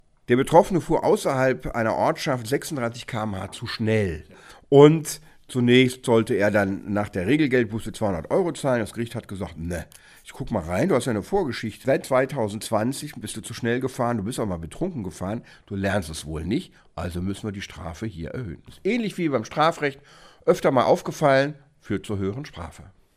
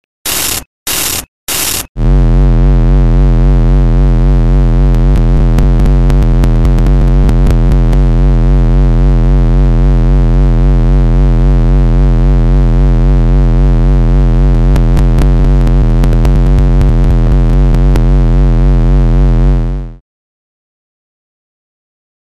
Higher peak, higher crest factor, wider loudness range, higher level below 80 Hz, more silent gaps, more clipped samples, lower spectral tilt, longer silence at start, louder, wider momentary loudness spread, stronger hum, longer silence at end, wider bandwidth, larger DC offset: about the same, 0 dBFS vs 0 dBFS; first, 22 dB vs 6 dB; first, 9 LU vs 2 LU; second, -48 dBFS vs -8 dBFS; second, none vs 0.66-0.86 s, 1.28-1.47 s, 1.89-1.95 s; neither; about the same, -6 dB/octave vs -6 dB/octave; about the same, 0.3 s vs 0.25 s; second, -24 LUFS vs -10 LUFS; first, 15 LU vs 2 LU; neither; second, 0.3 s vs 2.4 s; about the same, 15.5 kHz vs 14.5 kHz; neither